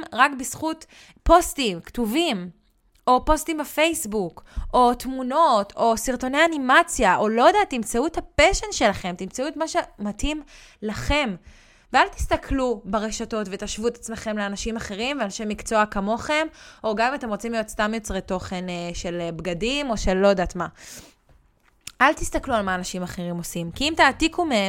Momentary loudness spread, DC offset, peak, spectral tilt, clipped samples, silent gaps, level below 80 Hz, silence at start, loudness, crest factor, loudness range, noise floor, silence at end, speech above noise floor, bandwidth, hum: 12 LU; under 0.1%; -2 dBFS; -3.5 dB/octave; under 0.1%; none; -38 dBFS; 0 s; -23 LUFS; 20 dB; 7 LU; -60 dBFS; 0 s; 37 dB; 16.5 kHz; none